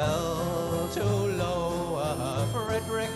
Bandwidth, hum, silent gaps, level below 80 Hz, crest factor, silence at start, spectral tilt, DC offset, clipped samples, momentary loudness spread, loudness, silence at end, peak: 14.5 kHz; none; none; -46 dBFS; 14 dB; 0 s; -5.5 dB/octave; under 0.1%; under 0.1%; 2 LU; -29 LUFS; 0 s; -16 dBFS